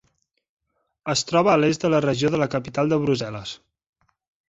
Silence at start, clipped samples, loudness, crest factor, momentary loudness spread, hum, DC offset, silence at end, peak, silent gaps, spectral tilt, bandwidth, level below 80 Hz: 1.05 s; under 0.1%; -21 LUFS; 18 dB; 16 LU; none; under 0.1%; 0.95 s; -4 dBFS; none; -5 dB/octave; 8.2 kHz; -56 dBFS